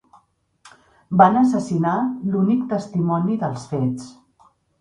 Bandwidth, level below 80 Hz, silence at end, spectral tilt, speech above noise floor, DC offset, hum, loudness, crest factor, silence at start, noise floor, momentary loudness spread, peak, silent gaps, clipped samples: 10.5 kHz; -60 dBFS; 0.7 s; -8 dB/octave; 39 dB; under 0.1%; none; -20 LUFS; 20 dB; 0.65 s; -58 dBFS; 10 LU; 0 dBFS; none; under 0.1%